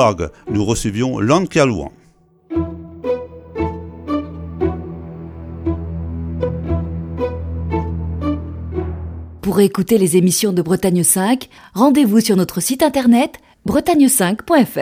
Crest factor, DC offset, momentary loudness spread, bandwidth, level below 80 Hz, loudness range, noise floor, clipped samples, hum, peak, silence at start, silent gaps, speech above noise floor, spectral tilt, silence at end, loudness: 16 dB; under 0.1%; 15 LU; 16.5 kHz; -34 dBFS; 10 LU; -52 dBFS; under 0.1%; none; 0 dBFS; 0 s; none; 37 dB; -5 dB/octave; 0 s; -17 LUFS